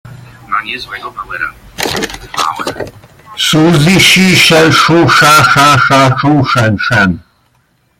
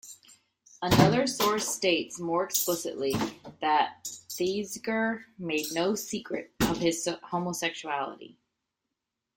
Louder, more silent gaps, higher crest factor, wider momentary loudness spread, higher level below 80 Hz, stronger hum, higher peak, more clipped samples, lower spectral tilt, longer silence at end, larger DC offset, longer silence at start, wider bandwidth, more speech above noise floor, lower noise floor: first, -8 LUFS vs -29 LUFS; neither; second, 10 dB vs 24 dB; first, 16 LU vs 10 LU; first, -40 dBFS vs -56 dBFS; neither; first, 0 dBFS vs -6 dBFS; first, 0.2% vs under 0.1%; about the same, -4 dB/octave vs -4 dB/octave; second, 0.8 s vs 1.05 s; neither; about the same, 0.05 s vs 0.05 s; about the same, 18 kHz vs 17 kHz; second, 46 dB vs 57 dB; second, -54 dBFS vs -86 dBFS